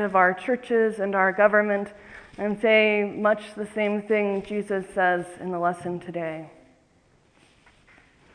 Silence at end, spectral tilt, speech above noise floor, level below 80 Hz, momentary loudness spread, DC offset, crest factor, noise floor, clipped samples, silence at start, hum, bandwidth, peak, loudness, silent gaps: 1.85 s; -6 dB/octave; 37 dB; -64 dBFS; 13 LU; under 0.1%; 20 dB; -61 dBFS; under 0.1%; 0 s; none; 10.5 kHz; -4 dBFS; -24 LUFS; none